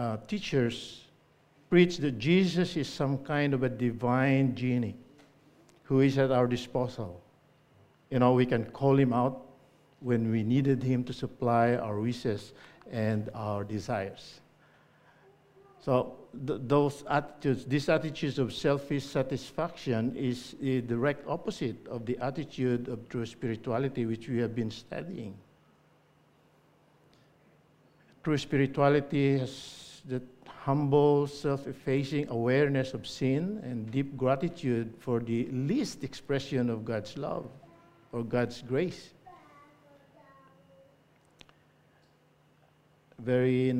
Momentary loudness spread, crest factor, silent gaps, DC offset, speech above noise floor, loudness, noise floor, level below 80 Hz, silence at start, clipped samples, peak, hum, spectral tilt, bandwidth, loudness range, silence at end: 13 LU; 22 dB; none; under 0.1%; 36 dB; -30 LUFS; -65 dBFS; -62 dBFS; 0 s; under 0.1%; -10 dBFS; none; -7 dB/octave; 12.5 kHz; 8 LU; 0 s